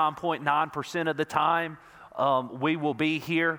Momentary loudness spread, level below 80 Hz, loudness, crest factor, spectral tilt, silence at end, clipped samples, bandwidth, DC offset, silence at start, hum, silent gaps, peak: 5 LU; -68 dBFS; -27 LUFS; 20 dB; -5.5 dB/octave; 0 s; under 0.1%; 19.5 kHz; under 0.1%; 0 s; none; none; -8 dBFS